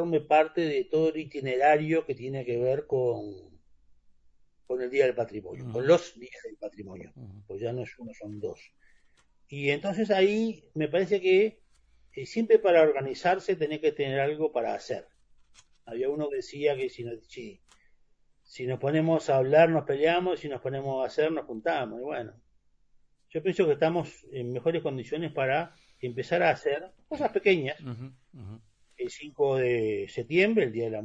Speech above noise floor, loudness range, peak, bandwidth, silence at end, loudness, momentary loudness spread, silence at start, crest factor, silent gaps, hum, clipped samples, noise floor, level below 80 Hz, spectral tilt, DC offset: 39 dB; 7 LU; -8 dBFS; 8 kHz; 0 s; -28 LUFS; 18 LU; 0 s; 20 dB; none; none; under 0.1%; -66 dBFS; -66 dBFS; -6.5 dB/octave; under 0.1%